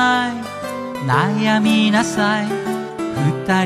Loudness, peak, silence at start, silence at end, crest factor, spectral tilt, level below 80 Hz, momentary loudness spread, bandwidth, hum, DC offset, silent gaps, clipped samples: -18 LUFS; -2 dBFS; 0 s; 0 s; 16 dB; -5 dB/octave; -56 dBFS; 11 LU; 13.5 kHz; none; under 0.1%; none; under 0.1%